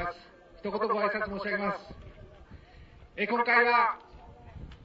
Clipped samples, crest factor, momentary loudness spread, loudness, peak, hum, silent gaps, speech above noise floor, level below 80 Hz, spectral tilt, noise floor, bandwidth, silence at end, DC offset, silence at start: under 0.1%; 20 dB; 26 LU; -28 LUFS; -12 dBFS; none; none; 25 dB; -54 dBFS; -6.5 dB/octave; -53 dBFS; 7.6 kHz; 0 s; under 0.1%; 0 s